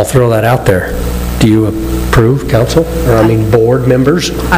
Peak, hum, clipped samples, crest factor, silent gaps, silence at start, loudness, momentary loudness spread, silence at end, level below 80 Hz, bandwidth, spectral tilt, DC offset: 0 dBFS; none; 0.8%; 10 dB; none; 0 s; -10 LUFS; 5 LU; 0 s; -20 dBFS; 16.5 kHz; -6.5 dB/octave; under 0.1%